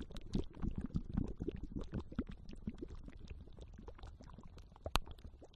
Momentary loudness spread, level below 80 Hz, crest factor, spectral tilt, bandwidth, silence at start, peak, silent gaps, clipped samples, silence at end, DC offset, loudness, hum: 15 LU; -48 dBFS; 32 dB; -6 dB/octave; 11.5 kHz; 0 s; -12 dBFS; none; under 0.1%; 0 s; under 0.1%; -46 LUFS; none